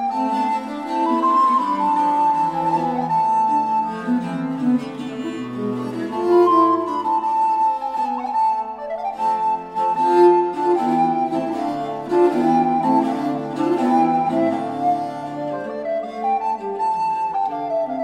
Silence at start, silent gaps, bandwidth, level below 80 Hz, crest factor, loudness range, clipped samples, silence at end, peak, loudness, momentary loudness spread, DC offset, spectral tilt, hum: 0 s; none; 10.5 kHz; -62 dBFS; 16 dB; 3 LU; under 0.1%; 0 s; -4 dBFS; -20 LUFS; 10 LU; under 0.1%; -7 dB/octave; none